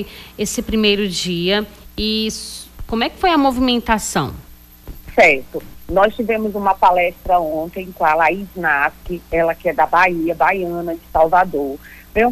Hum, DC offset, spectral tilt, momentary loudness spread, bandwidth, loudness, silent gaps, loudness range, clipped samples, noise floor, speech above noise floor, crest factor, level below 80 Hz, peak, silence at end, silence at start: none; under 0.1%; -4 dB/octave; 12 LU; 15.5 kHz; -17 LUFS; none; 3 LU; under 0.1%; -37 dBFS; 20 dB; 14 dB; -38 dBFS; -2 dBFS; 0 s; 0 s